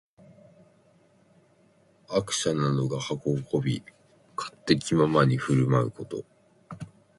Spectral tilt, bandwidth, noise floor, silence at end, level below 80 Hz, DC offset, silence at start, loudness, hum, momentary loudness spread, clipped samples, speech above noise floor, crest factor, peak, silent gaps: -5.5 dB/octave; 11.5 kHz; -62 dBFS; 0.3 s; -60 dBFS; under 0.1%; 2.1 s; -26 LUFS; none; 17 LU; under 0.1%; 37 dB; 22 dB; -6 dBFS; none